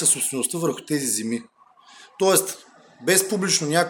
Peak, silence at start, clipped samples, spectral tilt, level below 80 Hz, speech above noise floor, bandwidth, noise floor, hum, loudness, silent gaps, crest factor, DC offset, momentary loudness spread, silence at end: -2 dBFS; 0 s; under 0.1%; -2.5 dB/octave; -72 dBFS; 27 dB; over 20 kHz; -50 dBFS; none; -22 LUFS; none; 22 dB; under 0.1%; 11 LU; 0 s